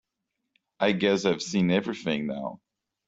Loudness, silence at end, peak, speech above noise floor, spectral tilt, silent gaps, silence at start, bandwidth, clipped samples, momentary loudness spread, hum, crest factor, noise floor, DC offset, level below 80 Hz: -26 LUFS; 0.5 s; -8 dBFS; 56 dB; -5.5 dB/octave; none; 0.8 s; 7.8 kHz; under 0.1%; 9 LU; none; 20 dB; -82 dBFS; under 0.1%; -66 dBFS